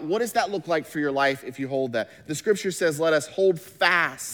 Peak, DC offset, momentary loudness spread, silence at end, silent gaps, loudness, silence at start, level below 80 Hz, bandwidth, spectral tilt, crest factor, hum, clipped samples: -6 dBFS; under 0.1%; 8 LU; 0 s; none; -24 LUFS; 0 s; -70 dBFS; over 20 kHz; -4 dB/octave; 20 dB; none; under 0.1%